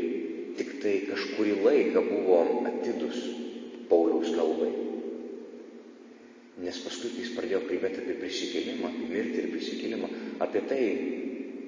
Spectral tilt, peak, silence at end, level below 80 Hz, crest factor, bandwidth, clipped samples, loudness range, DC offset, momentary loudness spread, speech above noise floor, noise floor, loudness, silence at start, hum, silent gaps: -4.5 dB/octave; -10 dBFS; 0 s; -72 dBFS; 20 dB; 7.8 kHz; under 0.1%; 8 LU; under 0.1%; 15 LU; 23 dB; -51 dBFS; -30 LUFS; 0 s; none; none